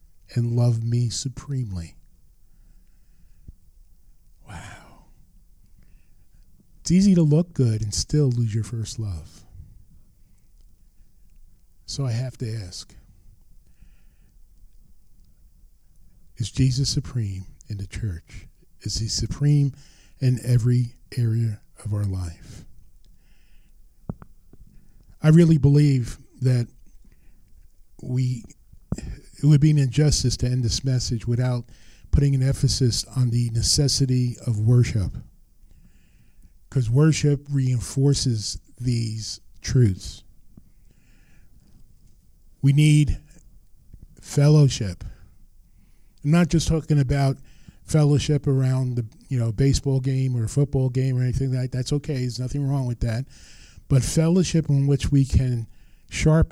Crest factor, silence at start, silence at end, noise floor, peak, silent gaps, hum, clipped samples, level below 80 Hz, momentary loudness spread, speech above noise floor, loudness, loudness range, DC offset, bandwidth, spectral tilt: 18 dB; 0.3 s; 0.05 s; -52 dBFS; -6 dBFS; none; none; under 0.1%; -38 dBFS; 16 LU; 32 dB; -22 LUFS; 12 LU; under 0.1%; 13.5 kHz; -6 dB/octave